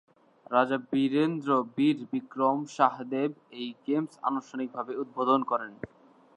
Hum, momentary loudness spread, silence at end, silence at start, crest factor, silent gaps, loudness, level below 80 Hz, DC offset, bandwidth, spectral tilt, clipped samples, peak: none; 11 LU; 0.5 s; 0.5 s; 22 dB; none; -29 LUFS; -74 dBFS; under 0.1%; 9 kHz; -6.5 dB/octave; under 0.1%; -8 dBFS